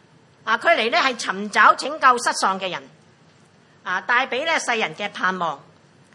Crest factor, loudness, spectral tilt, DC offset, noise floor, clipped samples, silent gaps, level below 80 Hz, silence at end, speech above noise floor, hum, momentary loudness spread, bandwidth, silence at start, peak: 20 dB; -20 LUFS; -2 dB/octave; under 0.1%; -54 dBFS; under 0.1%; none; -78 dBFS; 0.55 s; 33 dB; none; 13 LU; 11.5 kHz; 0.45 s; -2 dBFS